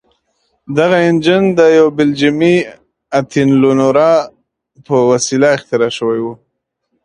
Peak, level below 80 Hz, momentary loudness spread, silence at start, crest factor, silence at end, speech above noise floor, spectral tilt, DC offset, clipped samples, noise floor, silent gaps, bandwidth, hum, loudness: 0 dBFS; -54 dBFS; 9 LU; 0.7 s; 12 dB; 0.7 s; 59 dB; -5.5 dB/octave; under 0.1%; under 0.1%; -70 dBFS; none; 10.5 kHz; none; -12 LUFS